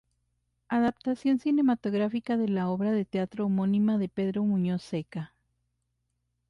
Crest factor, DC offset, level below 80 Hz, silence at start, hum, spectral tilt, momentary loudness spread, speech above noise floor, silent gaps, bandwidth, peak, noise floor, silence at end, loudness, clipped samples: 12 dB; under 0.1%; -66 dBFS; 0.7 s; 60 Hz at -55 dBFS; -8.5 dB/octave; 8 LU; 51 dB; none; 7 kHz; -16 dBFS; -78 dBFS; 1.25 s; -28 LUFS; under 0.1%